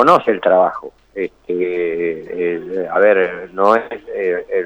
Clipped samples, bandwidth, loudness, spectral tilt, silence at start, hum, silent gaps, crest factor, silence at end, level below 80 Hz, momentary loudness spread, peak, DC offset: under 0.1%; 9 kHz; -17 LUFS; -6.5 dB/octave; 0 s; none; none; 16 dB; 0 s; -56 dBFS; 12 LU; 0 dBFS; under 0.1%